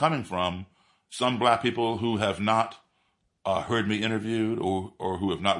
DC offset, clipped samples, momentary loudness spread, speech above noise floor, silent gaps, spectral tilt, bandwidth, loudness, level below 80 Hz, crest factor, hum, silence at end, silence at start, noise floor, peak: under 0.1%; under 0.1%; 8 LU; 46 dB; none; -5.5 dB/octave; 11.5 kHz; -27 LUFS; -64 dBFS; 20 dB; none; 0 s; 0 s; -72 dBFS; -8 dBFS